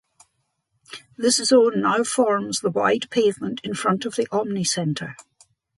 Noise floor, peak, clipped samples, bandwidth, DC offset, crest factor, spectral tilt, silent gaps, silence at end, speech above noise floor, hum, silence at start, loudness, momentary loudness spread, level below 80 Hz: -73 dBFS; -6 dBFS; under 0.1%; 11.5 kHz; under 0.1%; 18 dB; -4 dB/octave; none; 0.55 s; 51 dB; none; 0.9 s; -21 LUFS; 13 LU; -66 dBFS